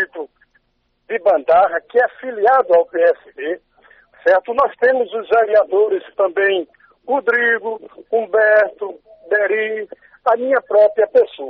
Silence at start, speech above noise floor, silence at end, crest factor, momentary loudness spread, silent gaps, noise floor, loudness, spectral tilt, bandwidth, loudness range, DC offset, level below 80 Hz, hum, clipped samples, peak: 0 s; 50 dB; 0 s; 12 dB; 13 LU; none; -66 dBFS; -16 LUFS; -0.5 dB/octave; 5.4 kHz; 1 LU; under 0.1%; -62 dBFS; none; under 0.1%; -4 dBFS